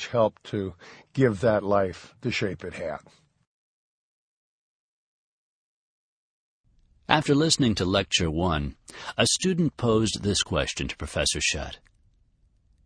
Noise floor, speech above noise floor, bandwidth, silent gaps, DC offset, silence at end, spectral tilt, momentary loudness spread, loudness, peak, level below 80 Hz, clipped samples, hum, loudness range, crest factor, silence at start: -64 dBFS; 38 dB; 10.5 kHz; 3.47-6.64 s; under 0.1%; 1.1 s; -4 dB/octave; 13 LU; -25 LUFS; -2 dBFS; -46 dBFS; under 0.1%; none; 12 LU; 26 dB; 0 s